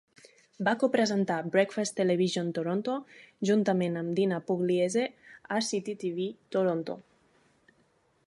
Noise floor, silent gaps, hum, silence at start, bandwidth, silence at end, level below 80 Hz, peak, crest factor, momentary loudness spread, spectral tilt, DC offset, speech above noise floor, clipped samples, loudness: -69 dBFS; none; none; 0.6 s; 11.5 kHz; 1.25 s; -78 dBFS; -12 dBFS; 18 dB; 8 LU; -5.5 dB/octave; under 0.1%; 40 dB; under 0.1%; -29 LUFS